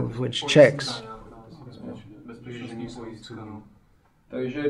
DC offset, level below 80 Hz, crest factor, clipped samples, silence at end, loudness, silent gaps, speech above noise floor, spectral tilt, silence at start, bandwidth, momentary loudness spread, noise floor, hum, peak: under 0.1%; -56 dBFS; 24 dB; under 0.1%; 0 s; -21 LUFS; none; 38 dB; -5 dB/octave; 0 s; 11.5 kHz; 27 LU; -61 dBFS; none; -2 dBFS